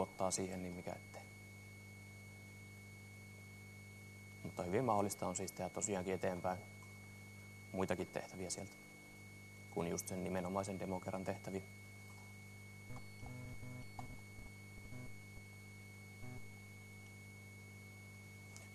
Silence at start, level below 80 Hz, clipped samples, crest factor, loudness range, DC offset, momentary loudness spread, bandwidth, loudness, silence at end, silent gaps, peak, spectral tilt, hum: 0 s; -70 dBFS; under 0.1%; 24 dB; 13 LU; under 0.1%; 15 LU; 13 kHz; -46 LUFS; 0 s; none; -22 dBFS; -4.5 dB/octave; 50 Hz at -60 dBFS